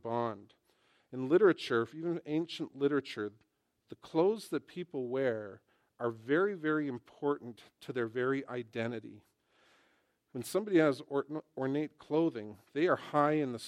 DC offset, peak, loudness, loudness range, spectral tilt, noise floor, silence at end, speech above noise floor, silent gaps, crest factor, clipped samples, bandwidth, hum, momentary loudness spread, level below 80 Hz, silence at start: under 0.1%; -14 dBFS; -34 LUFS; 4 LU; -6.5 dB/octave; -74 dBFS; 0 s; 40 dB; none; 20 dB; under 0.1%; 15.5 kHz; none; 14 LU; -82 dBFS; 0.05 s